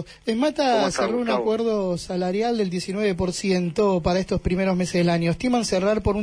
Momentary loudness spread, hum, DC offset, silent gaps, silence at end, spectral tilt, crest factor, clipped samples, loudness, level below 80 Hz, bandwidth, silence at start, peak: 4 LU; none; under 0.1%; none; 0 s; -5.5 dB/octave; 12 dB; under 0.1%; -23 LUFS; -42 dBFS; 11 kHz; 0 s; -10 dBFS